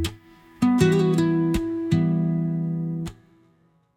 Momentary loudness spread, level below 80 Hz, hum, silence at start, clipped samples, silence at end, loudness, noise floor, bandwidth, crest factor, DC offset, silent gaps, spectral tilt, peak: 11 LU; -44 dBFS; none; 0 s; under 0.1%; 0.85 s; -23 LUFS; -62 dBFS; 14.5 kHz; 18 dB; under 0.1%; none; -7.5 dB/octave; -6 dBFS